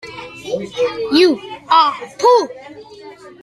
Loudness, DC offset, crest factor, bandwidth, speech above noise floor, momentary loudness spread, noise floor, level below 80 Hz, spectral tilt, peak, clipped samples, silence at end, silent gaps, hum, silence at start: -15 LUFS; under 0.1%; 16 dB; 13 kHz; 23 dB; 18 LU; -37 dBFS; -58 dBFS; -4 dB/octave; 0 dBFS; under 0.1%; 0.15 s; none; none; 0.05 s